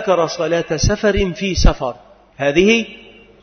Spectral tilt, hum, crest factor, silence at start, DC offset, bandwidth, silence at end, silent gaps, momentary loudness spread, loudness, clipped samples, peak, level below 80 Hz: -5 dB/octave; none; 16 dB; 0 s; under 0.1%; 6.6 kHz; 0.45 s; none; 9 LU; -17 LUFS; under 0.1%; 0 dBFS; -24 dBFS